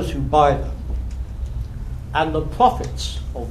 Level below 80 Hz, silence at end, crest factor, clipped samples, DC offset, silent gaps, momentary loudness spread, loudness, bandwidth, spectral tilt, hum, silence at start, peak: -28 dBFS; 0 s; 20 dB; under 0.1%; 0.3%; none; 14 LU; -22 LUFS; 13.5 kHz; -6 dB/octave; none; 0 s; -2 dBFS